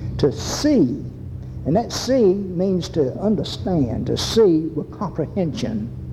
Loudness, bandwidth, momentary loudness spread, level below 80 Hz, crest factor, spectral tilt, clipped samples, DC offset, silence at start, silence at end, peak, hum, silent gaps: -21 LUFS; 15.5 kHz; 11 LU; -40 dBFS; 14 dB; -6 dB/octave; under 0.1%; under 0.1%; 0 s; 0 s; -6 dBFS; none; none